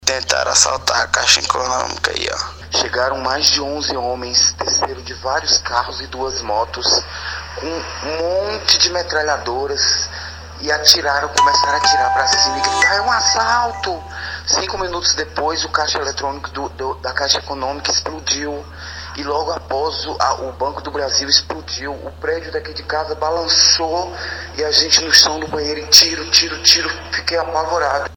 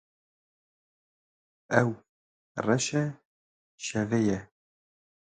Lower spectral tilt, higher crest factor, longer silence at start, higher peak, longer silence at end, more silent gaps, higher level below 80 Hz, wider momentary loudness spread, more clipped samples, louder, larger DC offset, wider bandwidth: second, -1 dB/octave vs -5 dB/octave; second, 18 dB vs 26 dB; second, 0 s vs 1.7 s; first, 0 dBFS vs -6 dBFS; second, 0 s vs 0.85 s; second, none vs 2.09-2.55 s, 3.25-3.78 s; first, -38 dBFS vs -64 dBFS; about the same, 14 LU vs 12 LU; neither; first, -15 LUFS vs -29 LUFS; neither; first, 16 kHz vs 9.4 kHz